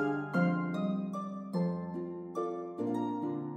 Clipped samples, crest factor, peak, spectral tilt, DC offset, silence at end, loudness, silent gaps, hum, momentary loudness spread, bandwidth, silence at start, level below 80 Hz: under 0.1%; 16 dB; -18 dBFS; -9 dB/octave; under 0.1%; 0 s; -35 LUFS; none; none; 8 LU; 9 kHz; 0 s; -78 dBFS